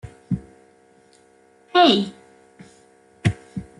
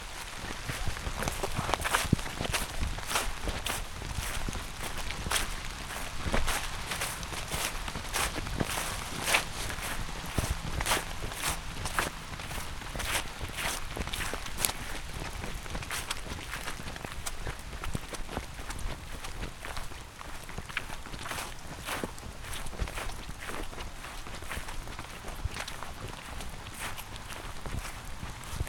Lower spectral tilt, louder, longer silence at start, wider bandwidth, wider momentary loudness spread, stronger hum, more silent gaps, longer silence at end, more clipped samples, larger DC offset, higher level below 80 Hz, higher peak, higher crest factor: first, -6 dB/octave vs -3 dB/octave; first, -21 LUFS vs -35 LUFS; about the same, 0.05 s vs 0 s; second, 11.5 kHz vs 19 kHz; first, 15 LU vs 10 LU; neither; neither; first, 0.15 s vs 0 s; neither; neither; second, -50 dBFS vs -40 dBFS; about the same, -2 dBFS vs -2 dBFS; second, 22 dB vs 34 dB